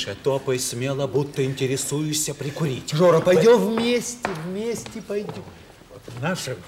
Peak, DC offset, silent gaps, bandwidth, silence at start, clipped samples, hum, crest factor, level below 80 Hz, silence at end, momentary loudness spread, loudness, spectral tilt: -6 dBFS; under 0.1%; none; 16.5 kHz; 0 s; under 0.1%; none; 16 dB; -56 dBFS; 0 s; 14 LU; -22 LUFS; -4.5 dB/octave